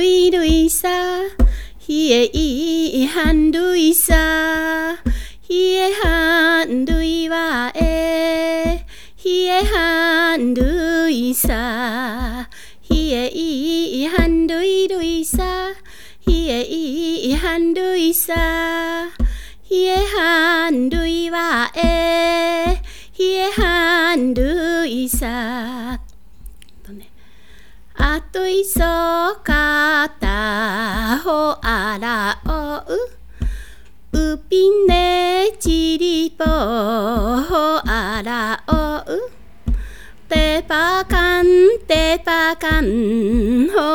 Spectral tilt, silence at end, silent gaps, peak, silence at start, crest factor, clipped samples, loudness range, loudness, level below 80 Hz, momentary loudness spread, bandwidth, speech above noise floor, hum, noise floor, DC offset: -4 dB/octave; 0 s; none; 0 dBFS; 0 s; 16 dB; under 0.1%; 5 LU; -17 LUFS; -26 dBFS; 10 LU; 19.5 kHz; 31 dB; none; -48 dBFS; 1%